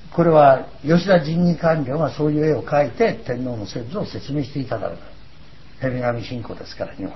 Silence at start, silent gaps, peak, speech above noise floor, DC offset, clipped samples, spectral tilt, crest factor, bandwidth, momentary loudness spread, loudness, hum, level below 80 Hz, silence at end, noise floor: 0.05 s; none; -2 dBFS; 26 dB; 1%; under 0.1%; -8 dB/octave; 18 dB; 6 kHz; 16 LU; -20 LUFS; none; -46 dBFS; 0 s; -46 dBFS